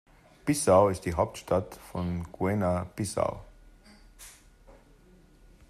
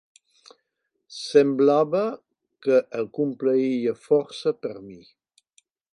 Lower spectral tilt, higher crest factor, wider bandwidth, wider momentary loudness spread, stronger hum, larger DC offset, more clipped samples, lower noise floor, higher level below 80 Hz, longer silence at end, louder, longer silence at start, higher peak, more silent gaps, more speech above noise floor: about the same, -6 dB/octave vs -6 dB/octave; about the same, 22 dB vs 20 dB; first, 15 kHz vs 10.5 kHz; first, 25 LU vs 17 LU; neither; neither; neither; second, -57 dBFS vs -78 dBFS; first, -54 dBFS vs -76 dBFS; about the same, 1 s vs 0.95 s; second, -28 LUFS vs -23 LUFS; second, 0.45 s vs 1.1 s; second, -8 dBFS vs -4 dBFS; neither; second, 30 dB vs 55 dB